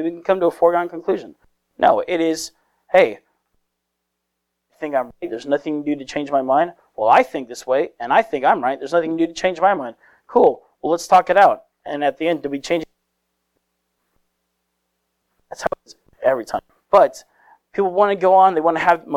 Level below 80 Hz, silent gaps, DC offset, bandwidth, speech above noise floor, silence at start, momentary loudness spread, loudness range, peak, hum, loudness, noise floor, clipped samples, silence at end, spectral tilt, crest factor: -60 dBFS; none; under 0.1%; 14.5 kHz; 59 dB; 0 s; 13 LU; 10 LU; -2 dBFS; none; -18 LUFS; -77 dBFS; under 0.1%; 0 s; -4.5 dB/octave; 18 dB